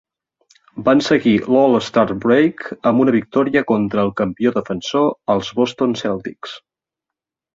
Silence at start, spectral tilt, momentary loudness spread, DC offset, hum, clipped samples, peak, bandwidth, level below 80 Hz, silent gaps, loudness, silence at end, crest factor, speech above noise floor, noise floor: 0.75 s; -6 dB/octave; 9 LU; under 0.1%; none; under 0.1%; -2 dBFS; 7.8 kHz; -54 dBFS; none; -17 LUFS; 0.95 s; 16 dB; 68 dB; -85 dBFS